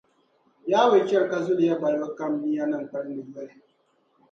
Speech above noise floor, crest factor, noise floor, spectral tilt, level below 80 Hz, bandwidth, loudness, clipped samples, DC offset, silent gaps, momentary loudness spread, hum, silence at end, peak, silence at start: 43 dB; 18 dB; -67 dBFS; -6 dB/octave; -78 dBFS; 7.4 kHz; -24 LUFS; under 0.1%; under 0.1%; none; 18 LU; none; 0.85 s; -6 dBFS; 0.65 s